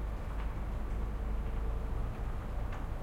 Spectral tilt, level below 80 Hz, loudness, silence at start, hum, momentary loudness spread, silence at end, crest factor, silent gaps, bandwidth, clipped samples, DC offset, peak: -7.5 dB/octave; -36 dBFS; -40 LUFS; 0 s; none; 2 LU; 0 s; 10 dB; none; 8.6 kHz; under 0.1%; under 0.1%; -24 dBFS